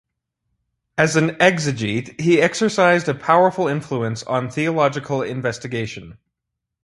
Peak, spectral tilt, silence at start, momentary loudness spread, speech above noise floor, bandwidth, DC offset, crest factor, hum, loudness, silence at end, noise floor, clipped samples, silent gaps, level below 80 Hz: 0 dBFS; -5.5 dB/octave; 0.95 s; 10 LU; 62 dB; 11.5 kHz; under 0.1%; 20 dB; none; -19 LUFS; 0.7 s; -81 dBFS; under 0.1%; none; -56 dBFS